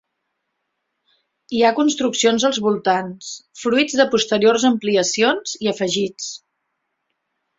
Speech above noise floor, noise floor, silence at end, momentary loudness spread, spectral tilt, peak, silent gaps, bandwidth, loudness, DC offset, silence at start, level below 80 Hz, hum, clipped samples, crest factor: 57 dB; -75 dBFS; 1.2 s; 14 LU; -3 dB/octave; -2 dBFS; none; 8 kHz; -18 LUFS; under 0.1%; 1.5 s; -64 dBFS; none; under 0.1%; 18 dB